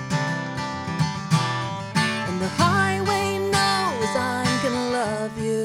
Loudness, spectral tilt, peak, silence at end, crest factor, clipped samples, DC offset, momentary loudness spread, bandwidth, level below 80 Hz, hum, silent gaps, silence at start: -23 LUFS; -4.5 dB/octave; -10 dBFS; 0 s; 14 dB; under 0.1%; under 0.1%; 7 LU; 16.5 kHz; -54 dBFS; none; none; 0 s